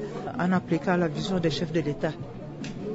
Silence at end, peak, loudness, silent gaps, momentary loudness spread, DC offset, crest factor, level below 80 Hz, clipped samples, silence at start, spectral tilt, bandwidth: 0 s; -12 dBFS; -28 LUFS; none; 12 LU; under 0.1%; 14 dB; -52 dBFS; under 0.1%; 0 s; -6.5 dB/octave; 8 kHz